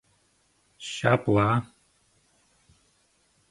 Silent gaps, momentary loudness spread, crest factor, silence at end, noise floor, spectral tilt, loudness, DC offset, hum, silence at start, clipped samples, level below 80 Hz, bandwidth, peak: none; 18 LU; 26 dB; 1.85 s; -67 dBFS; -6.5 dB/octave; -25 LUFS; under 0.1%; none; 0.8 s; under 0.1%; -56 dBFS; 11.5 kHz; -4 dBFS